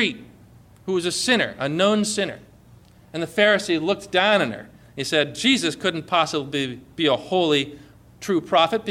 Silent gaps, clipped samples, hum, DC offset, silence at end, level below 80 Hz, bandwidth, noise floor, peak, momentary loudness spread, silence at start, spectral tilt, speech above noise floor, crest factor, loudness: none; under 0.1%; none; under 0.1%; 0 s; -58 dBFS; 16 kHz; -50 dBFS; -6 dBFS; 13 LU; 0 s; -3.5 dB/octave; 28 dB; 16 dB; -21 LUFS